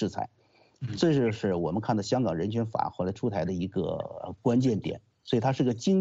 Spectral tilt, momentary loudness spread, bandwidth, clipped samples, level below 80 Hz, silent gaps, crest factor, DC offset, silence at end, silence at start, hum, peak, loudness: -7 dB/octave; 12 LU; 8 kHz; under 0.1%; -60 dBFS; none; 16 dB; under 0.1%; 0 s; 0 s; none; -12 dBFS; -29 LUFS